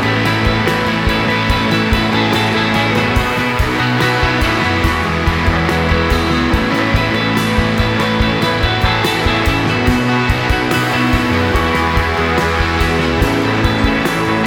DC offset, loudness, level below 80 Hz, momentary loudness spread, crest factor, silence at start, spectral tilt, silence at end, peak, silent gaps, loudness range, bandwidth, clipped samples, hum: under 0.1%; -14 LUFS; -24 dBFS; 1 LU; 14 dB; 0 s; -5.5 dB/octave; 0 s; 0 dBFS; none; 0 LU; 17.5 kHz; under 0.1%; none